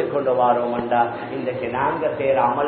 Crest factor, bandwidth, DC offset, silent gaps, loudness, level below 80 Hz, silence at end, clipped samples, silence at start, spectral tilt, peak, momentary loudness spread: 14 dB; 4.5 kHz; under 0.1%; none; -21 LUFS; -54 dBFS; 0 s; under 0.1%; 0 s; -11 dB/octave; -6 dBFS; 7 LU